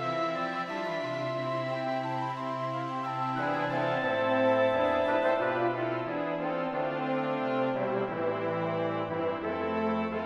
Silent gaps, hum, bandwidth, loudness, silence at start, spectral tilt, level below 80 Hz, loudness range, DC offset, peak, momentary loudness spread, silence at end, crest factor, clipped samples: none; none; 8.6 kHz; -30 LUFS; 0 s; -7 dB/octave; -66 dBFS; 4 LU; under 0.1%; -14 dBFS; 7 LU; 0 s; 16 dB; under 0.1%